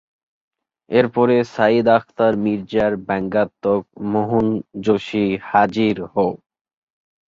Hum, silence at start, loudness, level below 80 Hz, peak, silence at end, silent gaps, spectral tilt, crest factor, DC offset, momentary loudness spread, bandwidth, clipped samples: none; 0.9 s; -19 LUFS; -54 dBFS; -2 dBFS; 0.95 s; none; -7.5 dB/octave; 18 dB; under 0.1%; 6 LU; 7.4 kHz; under 0.1%